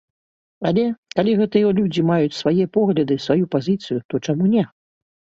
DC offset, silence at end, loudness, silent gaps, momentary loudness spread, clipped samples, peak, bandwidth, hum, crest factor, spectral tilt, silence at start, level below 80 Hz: under 0.1%; 0.75 s; -19 LUFS; 0.98-1.03 s, 4.05-4.09 s; 6 LU; under 0.1%; -2 dBFS; 7.6 kHz; none; 18 dB; -7.5 dB/octave; 0.6 s; -58 dBFS